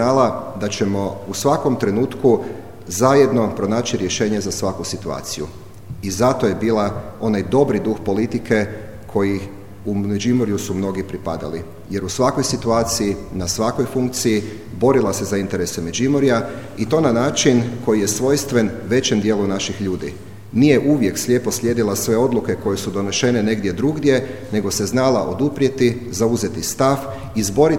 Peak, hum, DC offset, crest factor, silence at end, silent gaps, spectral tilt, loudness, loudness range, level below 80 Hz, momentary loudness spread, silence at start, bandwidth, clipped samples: 0 dBFS; none; 0.9%; 18 dB; 0 s; none; -5 dB/octave; -19 LUFS; 3 LU; -46 dBFS; 10 LU; 0 s; 17 kHz; under 0.1%